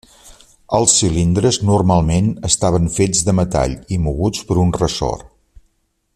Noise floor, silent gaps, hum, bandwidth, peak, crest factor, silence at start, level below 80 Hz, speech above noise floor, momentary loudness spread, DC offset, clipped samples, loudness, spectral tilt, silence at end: -64 dBFS; none; none; 14 kHz; 0 dBFS; 16 dB; 0.25 s; -32 dBFS; 49 dB; 8 LU; under 0.1%; under 0.1%; -16 LUFS; -5 dB/octave; 0.9 s